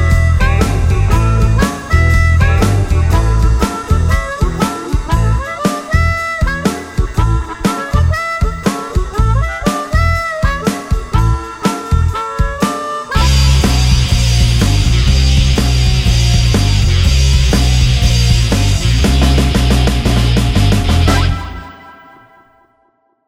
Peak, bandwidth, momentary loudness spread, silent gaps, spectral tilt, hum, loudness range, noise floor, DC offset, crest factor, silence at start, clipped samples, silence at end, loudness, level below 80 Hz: 0 dBFS; 15.5 kHz; 6 LU; none; -5 dB/octave; none; 4 LU; -58 dBFS; under 0.1%; 12 dB; 0 s; under 0.1%; 1.35 s; -13 LUFS; -14 dBFS